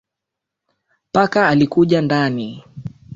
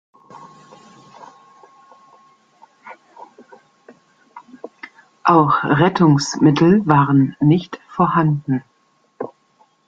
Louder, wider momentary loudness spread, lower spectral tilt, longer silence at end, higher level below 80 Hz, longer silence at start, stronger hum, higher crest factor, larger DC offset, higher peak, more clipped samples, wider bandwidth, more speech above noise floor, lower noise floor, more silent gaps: about the same, -16 LUFS vs -15 LUFS; second, 19 LU vs 23 LU; about the same, -7 dB/octave vs -7 dB/octave; second, 0 s vs 0.6 s; about the same, -54 dBFS vs -56 dBFS; first, 1.15 s vs 0.4 s; neither; about the same, 16 dB vs 20 dB; neither; about the same, -2 dBFS vs 0 dBFS; neither; about the same, 7.8 kHz vs 7.8 kHz; first, 67 dB vs 46 dB; first, -82 dBFS vs -61 dBFS; neither